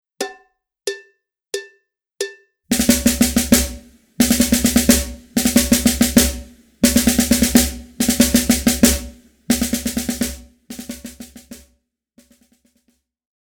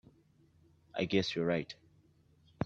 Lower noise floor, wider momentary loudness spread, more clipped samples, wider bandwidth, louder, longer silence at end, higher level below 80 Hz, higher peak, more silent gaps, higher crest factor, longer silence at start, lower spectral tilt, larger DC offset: about the same, -65 dBFS vs -67 dBFS; first, 19 LU vs 16 LU; neither; first, over 20 kHz vs 8 kHz; first, -16 LUFS vs -34 LUFS; first, 2 s vs 0 s; first, -32 dBFS vs -66 dBFS; first, 0 dBFS vs -16 dBFS; neither; about the same, 18 dB vs 22 dB; second, 0.2 s vs 0.95 s; second, -3 dB/octave vs -6 dB/octave; neither